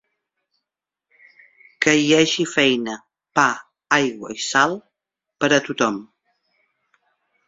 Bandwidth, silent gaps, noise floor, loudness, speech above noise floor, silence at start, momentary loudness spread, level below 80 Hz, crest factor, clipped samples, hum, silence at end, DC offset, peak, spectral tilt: 7.8 kHz; none; -85 dBFS; -19 LUFS; 67 dB; 1.8 s; 14 LU; -64 dBFS; 22 dB; under 0.1%; none; 1.45 s; under 0.1%; -2 dBFS; -3 dB/octave